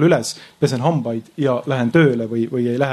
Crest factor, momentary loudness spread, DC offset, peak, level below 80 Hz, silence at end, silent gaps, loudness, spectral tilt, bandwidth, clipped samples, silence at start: 16 dB; 7 LU; under 0.1%; -2 dBFS; -58 dBFS; 0 s; none; -19 LUFS; -6.5 dB/octave; 13 kHz; under 0.1%; 0 s